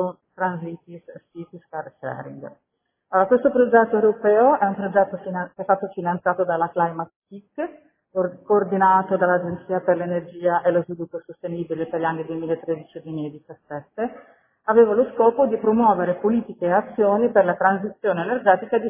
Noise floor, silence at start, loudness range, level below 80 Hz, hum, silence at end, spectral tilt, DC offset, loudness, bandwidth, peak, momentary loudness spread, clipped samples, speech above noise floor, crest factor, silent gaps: -53 dBFS; 0 s; 7 LU; -62 dBFS; none; 0 s; -11 dB/octave; under 0.1%; -21 LUFS; 3.6 kHz; -2 dBFS; 17 LU; under 0.1%; 32 dB; 20 dB; 7.16-7.22 s